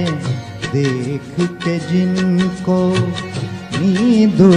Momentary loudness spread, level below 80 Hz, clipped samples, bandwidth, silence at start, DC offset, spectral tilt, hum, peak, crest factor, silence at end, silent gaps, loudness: 11 LU; -46 dBFS; under 0.1%; 10.5 kHz; 0 s; under 0.1%; -7 dB/octave; none; 0 dBFS; 16 dB; 0 s; none; -17 LUFS